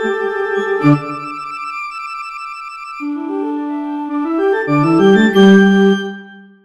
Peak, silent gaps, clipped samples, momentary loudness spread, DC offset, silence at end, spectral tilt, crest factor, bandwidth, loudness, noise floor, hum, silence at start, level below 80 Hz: 0 dBFS; none; under 0.1%; 17 LU; under 0.1%; 0.2 s; -7 dB/octave; 14 dB; 8.4 kHz; -14 LUFS; -36 dBFS; none; 0 s; -52 dBFS